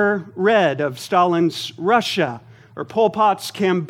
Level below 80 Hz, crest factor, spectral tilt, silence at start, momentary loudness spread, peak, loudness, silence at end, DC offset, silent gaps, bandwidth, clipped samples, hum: -68 dBFS; 16 dB; -5 dB/octave; 0 s; 8 LU; -2 dBFS; -19 LUFS; 0 s; under 0.1%; none; 16.5 kHz; under 0.1%; none